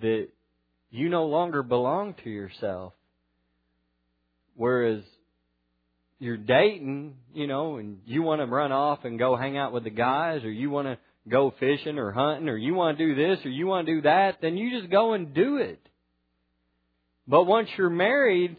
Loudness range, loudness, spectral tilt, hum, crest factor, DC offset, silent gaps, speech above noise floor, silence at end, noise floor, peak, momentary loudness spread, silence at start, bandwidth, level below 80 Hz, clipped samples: 8 LU; -26 LUFS; -9.5 dB/octave; 60 Hz at -60 dBFS; 20 dB; under 0.1%; none; 49 dB; 0 s; -74 dBFS; -6 dBFS; 13 LU; 0 s; 5 kHz; -70 dBFS; under 0.1%